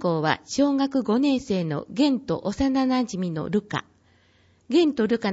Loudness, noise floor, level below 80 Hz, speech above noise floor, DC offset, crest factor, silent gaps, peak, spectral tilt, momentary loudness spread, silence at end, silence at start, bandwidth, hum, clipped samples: -24 LUFS; -60 dBFS; -52 dBFS; 37 dB; under 0.1%; 16 dB; none; -8 dBFS; -6 dB/octave; 7 LU; 0 s; 0 s; 8 kHz; none; under 0.1%